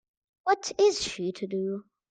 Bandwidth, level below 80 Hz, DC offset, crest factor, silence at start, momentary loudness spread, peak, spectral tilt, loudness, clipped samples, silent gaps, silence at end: 9.4 kHz; -64 dBFS; under 0.1%; 18 dB; 0.45 s; 10 LU; -12 dBFS; -3.5 dB/octave; -28 LUFS; under 0.1%; none; 0.3 s